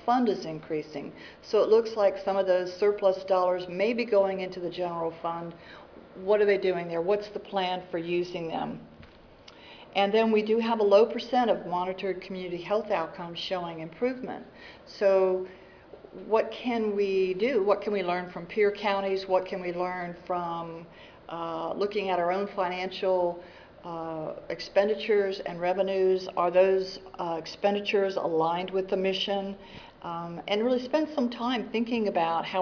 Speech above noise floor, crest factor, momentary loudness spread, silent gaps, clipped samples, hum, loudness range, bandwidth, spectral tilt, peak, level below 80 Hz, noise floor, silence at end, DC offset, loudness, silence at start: 24 dB; 18 dB; 14 LU; none; under 0.1%; none; 5 LU; 5.4 kHz; -6 dB/octave; -10 dBFS; -64 dBFS; -52 dBFS; 0 s; under 0.1%; -28 LUFS; 0 s